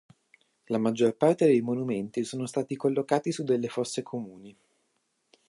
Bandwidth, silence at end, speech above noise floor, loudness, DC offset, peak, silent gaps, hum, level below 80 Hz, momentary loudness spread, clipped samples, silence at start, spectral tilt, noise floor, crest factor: 11.5 kHz; 1 s; 48 dB; -28 LUFS; under 0.1%; -8 dBFS; none; none; -76 dBFS; 10 LU; under 0.1%; 0.7 s; -6 dB/octave; -75 dBFS; 20 dB